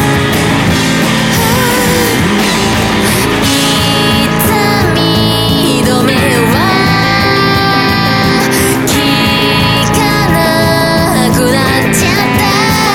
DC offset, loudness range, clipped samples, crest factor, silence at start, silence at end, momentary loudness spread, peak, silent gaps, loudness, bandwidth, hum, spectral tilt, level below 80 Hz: under 0.1%; 1 LU; under 0.1%; 10 dB; 0 s; 0 s; 1 LU; 0 dBFS; none; -9 LUFS; 18.5 kHz; none; -4 dB/octave; -28 dBFS